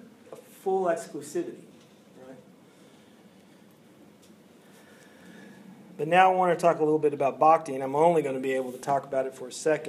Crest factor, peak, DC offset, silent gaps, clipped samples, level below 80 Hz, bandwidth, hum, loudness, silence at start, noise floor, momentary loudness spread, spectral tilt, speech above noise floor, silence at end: 24 dB; -4 dBFS; under 0.1%; none; under 0.1%; -84 dBFS; 15 kHz; none; -26 LUFS; 0.3 s; -55 dBFS; 14 LU; -5.5 dB/octave; 30 dB; 0 s